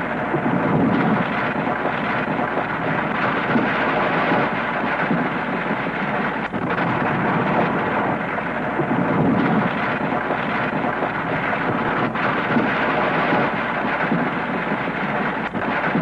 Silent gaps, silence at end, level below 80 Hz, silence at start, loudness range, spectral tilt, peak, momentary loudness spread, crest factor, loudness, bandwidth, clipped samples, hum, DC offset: none; 0 s; -50 dBFS; 0 s; 1 LU; -8 dB/octave; -6 dBFS; 4 LU; 14 dB; -21 LUFS; 9.8 kHz; under 0.1%; none; under 0.1%